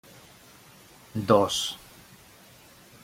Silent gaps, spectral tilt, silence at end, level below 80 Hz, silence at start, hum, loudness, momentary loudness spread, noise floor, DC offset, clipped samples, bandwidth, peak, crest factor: none; -4.5 dB/octave; 1.25 s; -62 dBFS; 1.15 s; none; -25 LUFS; 21 LU; -53 dBFS; under 0.1%; under 0.1%; 16.5 kHz; -6 dBFS; 26 dB